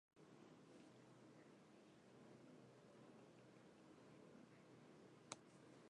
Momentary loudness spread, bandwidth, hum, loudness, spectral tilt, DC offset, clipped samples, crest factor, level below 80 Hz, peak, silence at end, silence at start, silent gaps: 8 LU; 10.5 kHz; none; -66 LUFS; -4 dB/octave; under 0.1%; under 0.1%; 34 dB; under -90 dBFS; -30 dBFS; 0 s; 0.15 s; none